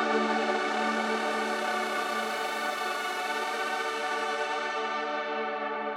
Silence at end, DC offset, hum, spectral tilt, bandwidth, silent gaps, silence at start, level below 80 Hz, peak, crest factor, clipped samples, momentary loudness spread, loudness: 0 s; under 0.1%; 50 Hz at -75 dBFS; -2.5 dB/octave; 17.5 kHz; none; 0 s; -88 dBFS; -14 dBFS; 16 dB; under 0.1%; 4 LU; -30 LUFS